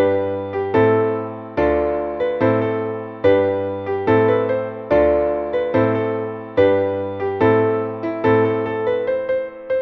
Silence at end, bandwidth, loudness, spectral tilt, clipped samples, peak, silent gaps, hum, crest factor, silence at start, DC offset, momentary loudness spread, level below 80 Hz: 0 s; 5.8 kHz; -19 LUFS; -9.5 dB/octave; under 0.1%; -4 dBFS; none; none; 14 dB; 0 s; under 0.1%; 8 LU; -44 dBFS